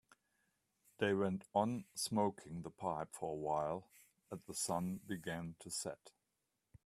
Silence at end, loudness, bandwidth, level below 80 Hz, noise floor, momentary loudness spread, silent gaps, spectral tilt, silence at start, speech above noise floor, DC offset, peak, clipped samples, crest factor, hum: 0.75 s; -41 LUFS; 15 kHz; -74 dBFS; -87 dBFS; 11 LU; none; -4.5 dB/octave; 1 s; 46 dB; under 0.1%; -20 dBFS; under 0.1%; 22 dB; none